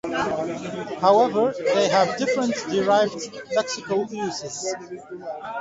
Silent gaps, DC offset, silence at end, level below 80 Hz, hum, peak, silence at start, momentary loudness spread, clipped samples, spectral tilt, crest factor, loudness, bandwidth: none; under 0.1%; 0 s; -64 dBFS; none; -4 dBFS; 0.05 s; 15 LU; under 0.1%; -4 dB/octave; 18 dB; -23 LUFS; 8 kHz